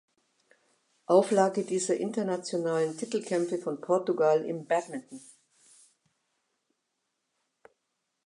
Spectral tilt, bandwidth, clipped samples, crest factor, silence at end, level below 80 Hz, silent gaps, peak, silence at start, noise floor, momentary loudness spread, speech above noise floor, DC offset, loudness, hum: -5 dB/octave; 11.5 kHz; under 0.1%; 22 dB; 3.05 s; -86 dBFS; none; -10 dBFS; 1.1 s; -81 dBFS; 13 LU; 53 dB; under 0.1%; -28 LUFS; none